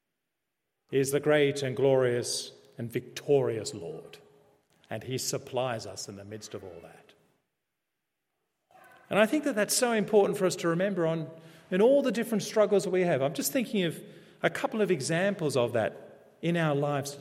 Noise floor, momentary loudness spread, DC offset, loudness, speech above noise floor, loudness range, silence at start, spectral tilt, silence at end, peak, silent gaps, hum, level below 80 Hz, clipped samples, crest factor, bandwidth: -85 dBFS; 16 LU; under 0.1%; -28 LUFS; 57 dB; 10 LU; 0.9 s; -4.5 dB/octave; 0 s; -8 dBFS; none; none; -76 dBFS; under 0.1%; 20 dB; 16 kHz